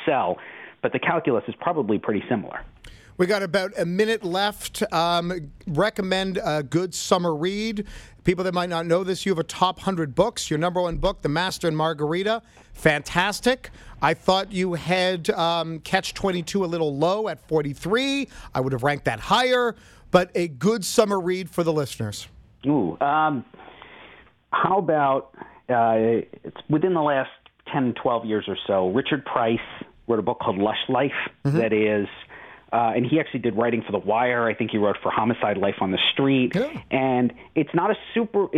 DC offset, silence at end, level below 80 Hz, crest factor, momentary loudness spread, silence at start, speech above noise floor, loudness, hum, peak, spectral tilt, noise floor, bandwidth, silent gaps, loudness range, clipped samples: under 0.1%; 0 s; -48 dBFS; 22 dB; 7 LU; 0 s; 27 dB; -23 LUFS; none; -2 dBFS; -5 dB/octave; -50 dBFS; 16 kHz; none; 2 LU; under 0.1%